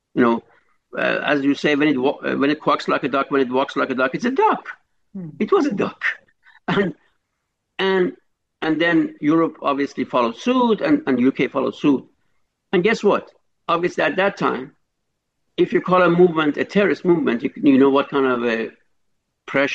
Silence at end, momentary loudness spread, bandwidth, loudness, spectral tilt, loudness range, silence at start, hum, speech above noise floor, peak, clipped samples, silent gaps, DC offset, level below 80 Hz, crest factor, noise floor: 0 s; 10 LU; 7.8 kHz; -19 LUFS; -6.5 dB/octave; 5 LU; 0.15 s; none; 57 dB; -4 dBFS; under 0.1%; none; under 0.1%; -64 dBFS; 16 dB; -76 dBFS